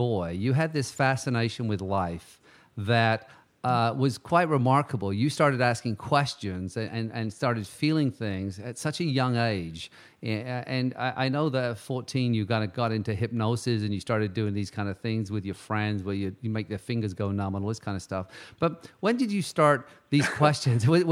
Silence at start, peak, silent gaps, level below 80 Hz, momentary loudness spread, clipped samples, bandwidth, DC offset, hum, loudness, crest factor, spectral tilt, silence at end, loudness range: 0 s; -4 dBFS; none; -62 dBFS; 10 LU; under 0.1%; 14 kHz; under 0.1%; none; -28 LUFS; 22 dB; -6 dB/octave; 0 s; 5 LU